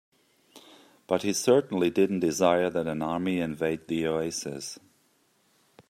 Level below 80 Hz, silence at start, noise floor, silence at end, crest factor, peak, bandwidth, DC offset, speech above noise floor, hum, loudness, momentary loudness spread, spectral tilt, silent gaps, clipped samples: -66 dBFS; 0.55 s; -67 dBFS; 1.15 s; 20 dB; -8 dBFS; 15.5 kHz; under 0.1%; 41 dB; none; -27 LUFS; 10 LU; -5 dB/octave; none; under 0.1%